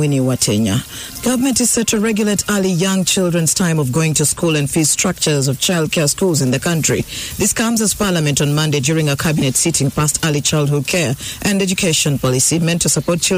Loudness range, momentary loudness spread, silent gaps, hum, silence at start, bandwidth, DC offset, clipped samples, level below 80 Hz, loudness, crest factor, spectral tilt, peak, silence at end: 1 LU; 3 LU; none; none; 0 s; 16 kHz; under 0.1%; under 0.1%; -42 dBFS; -15 LUFS; 10 dB; -4 dB/octave; -4 dBFS; 0 s